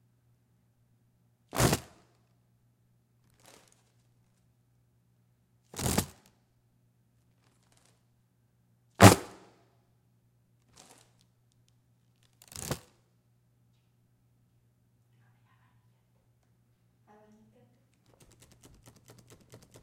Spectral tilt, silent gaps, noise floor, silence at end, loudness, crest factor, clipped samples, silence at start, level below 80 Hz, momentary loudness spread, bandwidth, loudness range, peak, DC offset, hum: -4.5 dB/octave; none; -70 dBFS; 7.05 s; -26 LUFS; 36 dB; under 0.1%; 1.55 s; -56 dBFS; 26 LU; 16 kHz; 19 LU; 0 dBFS; under 0.1%; none